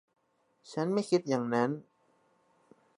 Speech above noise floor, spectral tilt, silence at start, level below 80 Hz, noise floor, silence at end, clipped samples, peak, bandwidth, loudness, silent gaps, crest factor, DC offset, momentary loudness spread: 41 dB; -6 dB/octave; 0.65 s; -82 dBFS; -71 dBFS; 1.15 s; under 0.1%; -14 dBFS; 11.5 kHz; -32 LUFS; none; 20 dB; under 0.1%; 11 LU